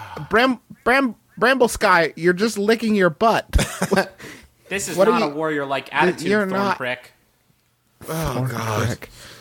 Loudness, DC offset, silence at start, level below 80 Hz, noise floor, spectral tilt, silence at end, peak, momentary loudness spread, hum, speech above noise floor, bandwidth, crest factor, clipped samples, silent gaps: -20 LUFS; under 0.1%; 0 s; -36 dBFS; -63 dBFS; -5 dB/octave; 0.05 s; -2 dBFS; 11 LU; none; 43 dB; 18.5 kHz; 18 dB; under 0.1%; none